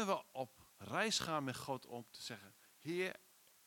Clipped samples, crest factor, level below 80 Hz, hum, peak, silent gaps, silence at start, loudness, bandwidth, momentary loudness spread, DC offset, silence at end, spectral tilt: under 0.1%; 22 dB; -80 dBFS; none; -22 dBFS; none; 0 s; -42 LUFS; 18 kHz; 17 LU; under 0.1%; 0.5 s; -3.5 dB/octave